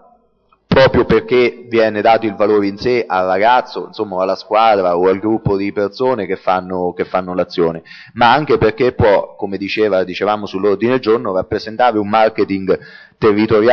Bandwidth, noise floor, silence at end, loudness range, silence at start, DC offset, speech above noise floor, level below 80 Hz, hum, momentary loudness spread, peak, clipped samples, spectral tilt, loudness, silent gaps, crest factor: 6.6 kHz; -57 dBFS; 0 s; 2 LU; 0.7 s; under 0.1%; 42 dB; -42 dBFS; none; 8 LU; -2 dBFS; under 0.1%; -7.5 dB/octave; -15 LUFS; none; 12 dB